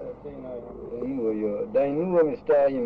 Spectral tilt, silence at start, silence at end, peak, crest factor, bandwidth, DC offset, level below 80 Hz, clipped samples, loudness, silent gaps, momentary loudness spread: -10 dB/octave; 0 s; 0 s; -10 dBFS; 14 dB; 5 kHz; under 0.1%; -56 dBFS; under 0.1%; -25 LUFS; none; 16 LU